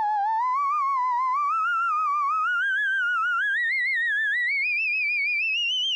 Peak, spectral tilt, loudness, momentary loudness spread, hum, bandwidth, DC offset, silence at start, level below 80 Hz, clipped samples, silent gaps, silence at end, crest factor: -20 dBFS; 5 dB/octave; -23 LUFS; 2 LU; 60 Hz at -80 dBFS; 11 kHz; under 0.1%; 0 s; -88 dBFS; under 0.1%; none; 0 s; 4 dB